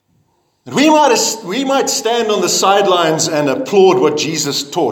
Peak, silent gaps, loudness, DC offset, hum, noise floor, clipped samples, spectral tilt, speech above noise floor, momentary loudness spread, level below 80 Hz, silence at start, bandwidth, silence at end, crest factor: 0 dBFS; none; -13 LUFS; under 0.1%; none; -60 dBFS; under 0.1%; -3 dB/octave; 47 dB; 7 LU; -64 dBFS; 0.65 s; 18 kHz; 0 s; 14 dB